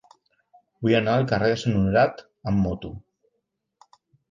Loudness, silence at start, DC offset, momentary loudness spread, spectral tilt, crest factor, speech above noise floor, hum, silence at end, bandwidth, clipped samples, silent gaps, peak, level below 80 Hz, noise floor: -23 LUFS; 0.8 s; under 0.1%; 15 LU; -7 dB/octave; 18 dB; 56 dB; none; 1.3 s; 7.6 kHz; under 0.1%; none; -6 dBFS; -46 dBFS; -78 dBFS